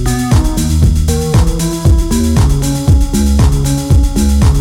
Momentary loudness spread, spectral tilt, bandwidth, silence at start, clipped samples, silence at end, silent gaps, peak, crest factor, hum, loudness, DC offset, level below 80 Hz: 3 LU; -6 dB/octave; 16.5 kHz; 0 s; under 0.1%; 0 s; none; 0 dBFS; 10 dB; none; -12 LUFS; under 0.1%; -12 dBFS